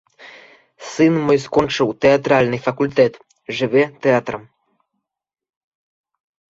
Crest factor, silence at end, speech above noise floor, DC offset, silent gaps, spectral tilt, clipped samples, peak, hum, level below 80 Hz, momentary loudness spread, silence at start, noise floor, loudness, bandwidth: 18 dB; 2.1 s; 69 dB; under 0.1%; none; -6 dB/octave; under 0.1%; -2 dBFS; none; -54 dBFS; 15 LU; 0.2 s; -85 dBFS; -17 LUFS; 8 kHz